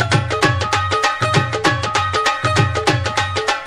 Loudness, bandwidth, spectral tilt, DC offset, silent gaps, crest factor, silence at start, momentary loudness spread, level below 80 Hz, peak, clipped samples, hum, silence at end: -17 LUFS; 14.5 kHz; -4 dB/octave; under 0.1%; none; 18 dB; 0 s; 2 LU; -42 dBFS; 0 dBFS; under 0.1%; none; 0 s